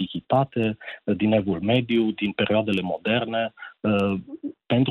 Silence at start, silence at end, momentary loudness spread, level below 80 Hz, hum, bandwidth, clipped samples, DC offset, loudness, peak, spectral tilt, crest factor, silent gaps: 0 s; 0 s; 8 LU; -58 dBFS; none; 5.2 kHz; under 0.1%; under 0.1%; -24 LUFS; -10 dBFS; -8 dB/octave; 14 dB; none